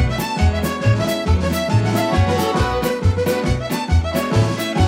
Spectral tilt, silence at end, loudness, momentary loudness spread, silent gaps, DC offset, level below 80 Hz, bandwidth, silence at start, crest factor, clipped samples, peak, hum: -6 dB/octave; 0 s; -18 LUFS; 2 LU; none; under 0.1%; -26 dBFS; 16.5 kHz; 0 s; 12 dB; under 0.1%; -4 dBFS; none